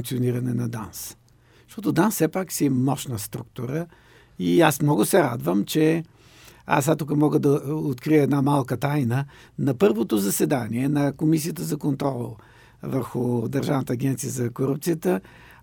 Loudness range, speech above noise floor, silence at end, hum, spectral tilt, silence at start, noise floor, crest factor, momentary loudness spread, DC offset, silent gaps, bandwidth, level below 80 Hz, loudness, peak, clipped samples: 4 LU; 27 dB; 0.4 s; none; -6 dB/octave; 0 s; -50 dBFS; 22 dB; 12 LU; under 0.1%; none; over 20 kHz; -58 dBFS; -23 LUFS; -2 dBFS; under 0.1%